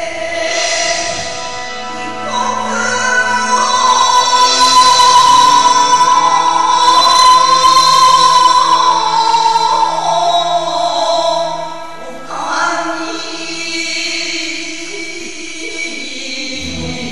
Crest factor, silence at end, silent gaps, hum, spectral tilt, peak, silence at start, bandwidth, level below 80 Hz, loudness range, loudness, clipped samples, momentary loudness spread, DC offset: 12 dB; 0 s; none; none; -0.5 dB/octave; 0 dBFS; 0 s; 13 kHz; -46 dBFS; 11 LU; -11 LUFS; under 0.1%; 15 LU; 3%